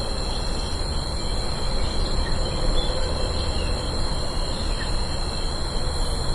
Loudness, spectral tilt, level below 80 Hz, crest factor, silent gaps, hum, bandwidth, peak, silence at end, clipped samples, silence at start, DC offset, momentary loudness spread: -27 LUFS; -4.5 dB/octave; -26 dBFS; 14 dB; none; none; 11.5 kHz; -10 dBFS; 0 s; under 0.1%; 0 s; under 0.1%; 2 LU